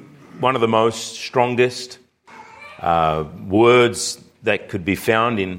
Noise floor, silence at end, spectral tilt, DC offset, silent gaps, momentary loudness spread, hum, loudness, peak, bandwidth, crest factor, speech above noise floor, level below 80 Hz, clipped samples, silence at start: -44 dBFS; 0 s; -4.5 dB/octave; under 0.1%; none; 13 LU; none; -19 LUFS; -2 dBFS; 16.5 kHz; 18 dB; 26 dB; -50 dBFS; under 0.1%; 0 s